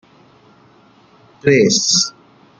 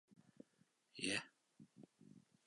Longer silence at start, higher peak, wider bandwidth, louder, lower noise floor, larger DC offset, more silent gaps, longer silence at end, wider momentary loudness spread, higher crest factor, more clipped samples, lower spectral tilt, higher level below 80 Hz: first, 1.45 s vs 0.1 s; first, 0 dBFS vs -28 dBFS; about the same, 10.5 kHz vs 11 kHz; first, -14 LUFS vs -44 LUFS; second, -49 dBFS vs -79 dBFS; neither; neither; first, 0.5 s vs 0.25 s; second, 9 LU vs 25 LU; second, 18 dB vs 26 dB; neither; about the same, -3 dB/octave vs -2.5 dB/octave; first, -56 dBFS vs -86 dBFS